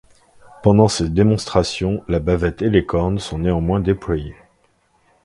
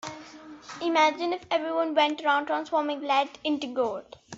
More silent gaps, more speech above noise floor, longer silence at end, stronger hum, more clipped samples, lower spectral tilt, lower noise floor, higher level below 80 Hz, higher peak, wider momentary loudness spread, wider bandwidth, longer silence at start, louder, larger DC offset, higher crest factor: neither; first, 43 dB vs 20 dB; first, 0.9 s vs 0 s; neither; neither; first, -6.5 dB/octave vs -3 dB/octave; first, -60 dBFS vs -46 dBFS; first, -34 dBFS vs -72 dBFS; first, 0 dBFS vs -8 dBFS; second, 7 LU vs 17 LU; first, 11.5 kHz vs 8 kHz; first, 0.6 s vs 0.05 s; first, -18 LUFS vs -26 LUFS; neither; about the same, 18 dB vs 18 dB